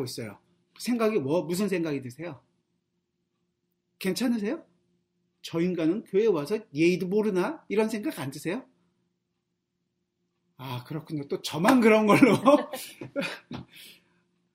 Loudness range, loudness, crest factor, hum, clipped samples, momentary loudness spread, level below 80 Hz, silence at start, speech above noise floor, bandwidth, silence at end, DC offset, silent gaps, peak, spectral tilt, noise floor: 11 LU; -26 LUFS; 24 dB; none; under 0.1%; 19 LU; -70 dBFS; 0 s; 54 dB; 16 kHz; 0.65 s; under 0.1%; none; -4 dBFS; -6 dB/octave; -80 dBFS